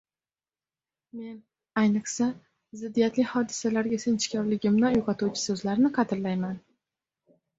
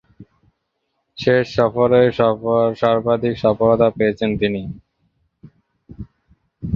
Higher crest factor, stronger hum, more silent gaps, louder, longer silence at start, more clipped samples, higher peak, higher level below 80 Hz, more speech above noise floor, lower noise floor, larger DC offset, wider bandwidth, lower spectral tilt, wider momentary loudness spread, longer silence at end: about the same, 18 dB vs 18 dB; neither; neither; second, -27 LUFS vs -17 LUFS; first, 1.15 s vs 0.2 s; neither; second, -10 dBFS vs -2 dBFS; second, -64 dBFS vs -46 dBFS; first, over 64 dB vs 56 dB; first, under -90 dBFS vs -72 dBFS; neither; first, 8 kHz vs 7 kHz; second, -5 dB/octave vs -8 dB/octave; about the same, 17 LU vs 19 LU; first, 1 s vs 0 s